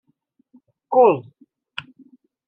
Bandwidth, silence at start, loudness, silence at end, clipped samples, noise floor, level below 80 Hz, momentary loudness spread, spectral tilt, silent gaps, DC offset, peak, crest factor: 5.2 kHz; 0.9 s; -17 LUFS; 1.25 s; under 0.1%; -66 dBFS; -76 dBFS; 20 LU; -8 dB/octave; none; under 0.1%; -4 dBFS; 20 dB